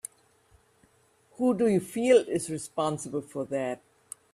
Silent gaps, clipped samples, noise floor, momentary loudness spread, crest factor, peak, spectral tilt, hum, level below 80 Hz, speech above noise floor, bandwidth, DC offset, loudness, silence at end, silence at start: none; under 0.1%; -64 dBFS; 19 LU; 20 dB; -10 dBFS; -5.5 dB/octave; none; -70 dBFS; 38 dB; 14 kHz; under 0.1%; -28 LUFS; 0.55 s; 1.4 s